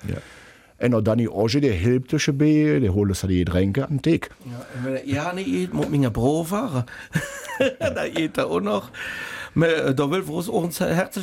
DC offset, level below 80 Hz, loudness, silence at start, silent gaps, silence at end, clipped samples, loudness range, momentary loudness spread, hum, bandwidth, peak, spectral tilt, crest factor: under 0.1%; -46 dBFS; -23 LUFS; 0 s; none; 0 s; under 0.1%; 4 LU; 10 LU; none; 16.5 kHz; -8 dBFS; -6.5 dB/octave; 14 dB